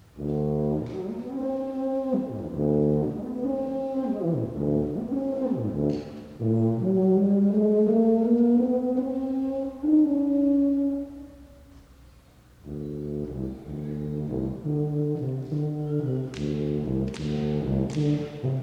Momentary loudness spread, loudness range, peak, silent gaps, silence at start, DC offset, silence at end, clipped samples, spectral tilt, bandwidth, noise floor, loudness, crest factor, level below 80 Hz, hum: 12 LU; 9 LU; -12 dBFS; none; 0.15 s; under 0.1%; 0 s; under 0.1%; -10 dB/octave; 9 kHz; -54 dBFS; -26 LUFS; 14 dB; -48 dBFS; none